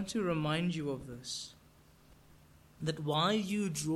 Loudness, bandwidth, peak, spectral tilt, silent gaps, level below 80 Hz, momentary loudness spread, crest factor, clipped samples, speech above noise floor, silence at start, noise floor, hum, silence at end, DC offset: -35 LUFS; 15.5 kHz; -18 dBFS; -5 dB/octave; none; -64 dBFS; 11 LU; 18 dB; under 0.1%; 28 dB; 0 s; -62 dBFS; none; 0 s; under 0.1%